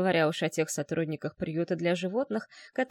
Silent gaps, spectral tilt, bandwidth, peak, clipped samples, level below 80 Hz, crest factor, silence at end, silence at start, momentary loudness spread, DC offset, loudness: none; -5 dB/octave; 17 kHz; -12 dBFS; under 0.1%; -68 dBFS; 16 dB; 0.05 s; 0 s; 8 LU; under 0.1%; -31 LUFS